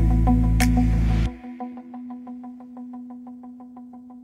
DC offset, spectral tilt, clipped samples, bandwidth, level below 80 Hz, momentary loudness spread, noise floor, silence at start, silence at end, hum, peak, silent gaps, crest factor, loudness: under 0.1%; -7 dB/octave; under 0.1%; 14.5 kHz; -26 dBFS; 22 LU; -42 dBFS; 0 s; 0 s; none; -6 dBFS; none; 18 dB; -22 LUFS